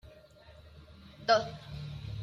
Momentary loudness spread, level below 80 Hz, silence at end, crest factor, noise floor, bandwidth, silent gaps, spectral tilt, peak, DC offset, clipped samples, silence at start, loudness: 26 LU; -56 dBFS; 0 s; 24 dB; -56 dBFS; 7.4 kHz; none; -4.5 dB/octave; -12 dBFS; under 0.1%; under 0.1%; 0.05 s; -32 LUFS